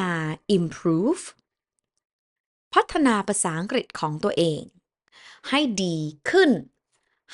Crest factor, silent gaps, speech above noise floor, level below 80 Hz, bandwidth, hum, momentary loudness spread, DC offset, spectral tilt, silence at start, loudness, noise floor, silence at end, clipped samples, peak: 20 dB; 2.05-2.71 s; 59 dB; -60 dBFS; 11.5 kHz; none; 9 LU; under 0.1%; -4.5 dB/octave; 0 s; -23 LUFS; -82 dBFS; 0 s; under 0.1%; -4 dBFS